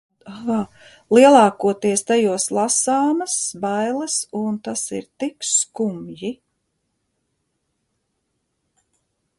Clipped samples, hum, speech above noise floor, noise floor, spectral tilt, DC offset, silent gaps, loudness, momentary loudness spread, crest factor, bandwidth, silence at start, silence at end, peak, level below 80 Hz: under 0.1%; none; 54 dB; -73 dBFS; -3.5 dB/octave; under 0.1%; none; -19 LUFS; 16 LU; 20 dB; 11.5 kHz; 0.25 s; 3.05 s; 0 dBFS; -64 dBFS